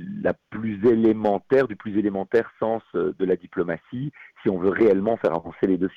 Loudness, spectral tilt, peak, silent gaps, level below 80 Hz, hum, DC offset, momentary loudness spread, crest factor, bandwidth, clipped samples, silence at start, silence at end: -23 LUFS; -9 dB/octave; -10 dBFS; none; -58 dBFS; none; under 0.1%; 10 LU; 14 dB; 6.2 kHz; under 0.1%; 0 s; 0.05 s